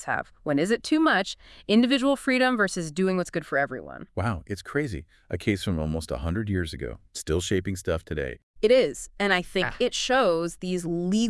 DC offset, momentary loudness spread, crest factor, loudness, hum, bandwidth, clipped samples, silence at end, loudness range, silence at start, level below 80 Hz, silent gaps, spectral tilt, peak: under 0.1%; 12 LU; 18 dB; -26 LUFS; none; 12 kHz; under 0.1%; 0 s; 6 LU; 0 s; -46 dBFS; 8.43-8.54 s; -5 dB/octave; -8 dBFS